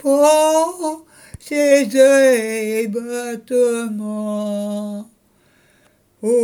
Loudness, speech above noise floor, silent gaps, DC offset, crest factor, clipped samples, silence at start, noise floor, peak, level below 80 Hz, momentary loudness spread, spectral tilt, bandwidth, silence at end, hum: -17 LUFS; 40 dB; none; under 0.1%; 16 dB; under 0.1%; 0.05 s; -57 dBFS; -2 dBFS; -58 dBFS; 14 LU; -4 dB/octave; 20 kHz; 0 s; none